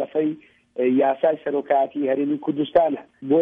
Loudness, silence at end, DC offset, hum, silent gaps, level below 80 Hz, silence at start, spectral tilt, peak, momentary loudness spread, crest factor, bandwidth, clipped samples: -22 LUFS; 0 s; under 0.1%; none; none; -64 dBFS; 0 s; -9.5 dB/octave; -6 dBFS; 8 LU; 16 dB; 3.8 kHz; under 0.1%